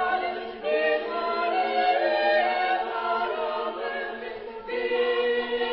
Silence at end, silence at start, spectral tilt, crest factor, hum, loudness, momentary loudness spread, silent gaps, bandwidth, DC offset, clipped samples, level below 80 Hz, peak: 0 s; 0 s; -6.5 dB/octave; 14 dB; none; -26 LUFS; 9 LU; none; 5.8 kHz; under 0.1%; under 0.1%; -64 dBFS; -12 dBFS